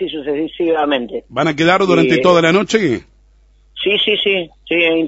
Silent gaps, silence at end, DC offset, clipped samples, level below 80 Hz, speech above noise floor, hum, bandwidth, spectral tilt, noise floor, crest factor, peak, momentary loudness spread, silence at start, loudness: none; 0 s; under 0.1%; under 0.1%; -48 dBFS; 35 dB; none; 8 kHz; -5 dB/octave; -50 dBFS; 16 dB; 0 dBFS; 10 LU; 0 s; -15 LUFS